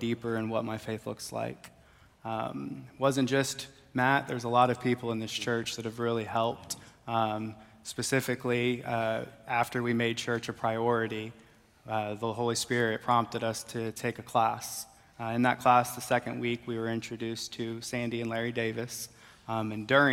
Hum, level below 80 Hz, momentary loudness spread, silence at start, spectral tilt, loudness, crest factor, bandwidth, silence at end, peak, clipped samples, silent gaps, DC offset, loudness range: none; -68 dBFS; 12 LU; 0 s; -4.5 dB/octave; -31 LUFS; 22 dB; 16.5 kHz; 0 s; -10 dBFS; under 0.1%; none; under 0.1%; 4 LU